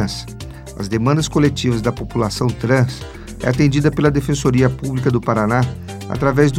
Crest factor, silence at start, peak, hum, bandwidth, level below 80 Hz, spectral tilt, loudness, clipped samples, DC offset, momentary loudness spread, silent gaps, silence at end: 16 dB; 0 s; 0 dBFS; none; 15 kHz; -36 dBFS; -6.5 dB/octave; -17 LUFS; under 0.1%; under 0.1%; 13 LU; none; 0 s